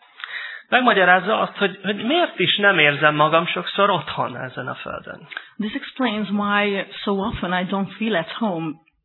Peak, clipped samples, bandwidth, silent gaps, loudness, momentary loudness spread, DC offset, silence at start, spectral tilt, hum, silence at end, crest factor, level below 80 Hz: 0 dBFS; under 0.1%; 4.3 kHz; none; -20 LUFS; 16 LU; under 0.1%; 0.2 s; -8 dB/octave; none; 0.3 s; 20 dB; -52 dBFS